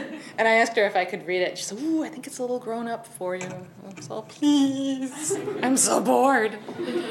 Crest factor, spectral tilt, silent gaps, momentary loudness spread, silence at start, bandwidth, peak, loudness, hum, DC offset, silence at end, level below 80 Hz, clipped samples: 18 dB; -3 dB/octave; none; 15 LU; 0 s; 16 kHz; -6 dBFS; -24 LUFS; none; under 0.1%; 0 s; -76 dBFS; under 0.1%